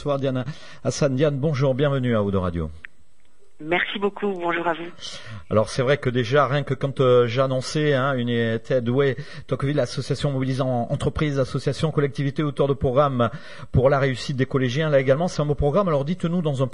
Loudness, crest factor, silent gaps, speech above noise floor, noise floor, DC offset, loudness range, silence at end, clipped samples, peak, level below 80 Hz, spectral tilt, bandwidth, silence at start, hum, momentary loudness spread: -22 LUFS; 16 dB; none; 40 dB; -62 dBFS; 1%; 4 LU; 0.05 s; under 0.1%; -6 dBFS; -44 dBFS; -6.5 dB/octave; 11 kHz; 0 s; none; 8 LU